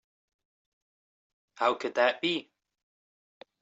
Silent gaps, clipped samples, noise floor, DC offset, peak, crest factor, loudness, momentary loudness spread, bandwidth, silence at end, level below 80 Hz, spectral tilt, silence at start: none; under 0.1%; under -90 dBFS; under 0.1%; -12 dBFS; 22 dB; -29 LUFS; 5 LU; 8 kHz; 1.2 s; -84 dBFS; -4 dB/octave; 1.6 s